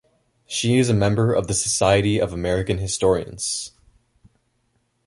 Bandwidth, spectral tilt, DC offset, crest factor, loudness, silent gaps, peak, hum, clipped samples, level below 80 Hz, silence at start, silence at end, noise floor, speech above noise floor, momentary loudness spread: 11.5 kHz; -4.5 dB/octave; under 0.1%; 20 dB; -21 LUFS; none; -2 dBFS; none; under 0.1%; -42 dBFS; 0.5 s; 1.4 s; -68 dBFS; 48 dB; 8 LU